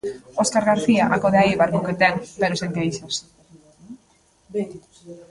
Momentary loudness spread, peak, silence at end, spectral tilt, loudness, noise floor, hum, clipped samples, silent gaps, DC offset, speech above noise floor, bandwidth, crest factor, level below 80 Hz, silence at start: 12 LU; -4 dBFS; 0.1 s; -5 dB/octave; -20 LUFS; -59 dBFS; none; under 0.1%; none; under 0.1%; 38 dB; 11.5 kHz; 18 dB; -54 dBFS; 0.05 s